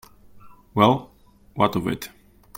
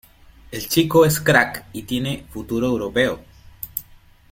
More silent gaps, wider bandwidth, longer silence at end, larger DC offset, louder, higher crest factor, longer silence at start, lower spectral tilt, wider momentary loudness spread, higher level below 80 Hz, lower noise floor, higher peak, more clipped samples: neither; about the same, 16.5 kHz vs 17 kHz; about the same, 0.5 s vs 0.5 s; neither; about the same, -22 LUFS vs -20 LUFS; about the same, 22 dB vs 20 dB; second, 0.35 s vs 0.5 s; first, -6.5 dB/octave vs -4.5 dB/octave; about the same, 18 LU vs 17 LU; second, -52 dBFS vs -46 dBFS; about the same, -46 dBFS vs -48 dBFS; about the same, -2 dBFS vs 0 dBFS; neither